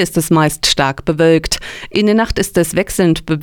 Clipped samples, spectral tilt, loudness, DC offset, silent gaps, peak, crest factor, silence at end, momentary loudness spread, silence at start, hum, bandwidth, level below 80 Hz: under 0.1%; -4.5 dB/octave; -14 LUFS; under 0.1%; none; 0 dBFS; 14 dB; 0 s; 4 LU; 0 s; none; 20 kHz; -32 dBFS